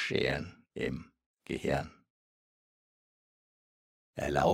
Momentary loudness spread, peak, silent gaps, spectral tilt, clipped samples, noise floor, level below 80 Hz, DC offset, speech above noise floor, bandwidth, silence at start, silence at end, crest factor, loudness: 16 LU; -14 dBFS; 1.26-1.34 s, 2.10-4.13 s; -5.5 dB/octave; under 0.1%; under -90 dBFS; -56 dBFS; under 0.1%; over 58 dB; 16 kHz; 0 s; 0 s; 22 dB; -35 LUFS